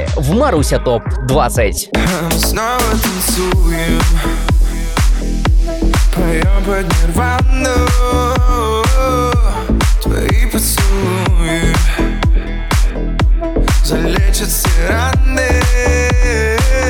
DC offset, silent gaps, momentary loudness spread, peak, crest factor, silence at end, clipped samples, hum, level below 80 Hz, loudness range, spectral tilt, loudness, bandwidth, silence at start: under 0.1%; none; 3 LU; -2 dBFS; 10 dB; 0 s; under 0.1%; none; -14 dBFS; 1 LU; -5 dB/octave; -14 LUFS; 18.5 kHz; 0 s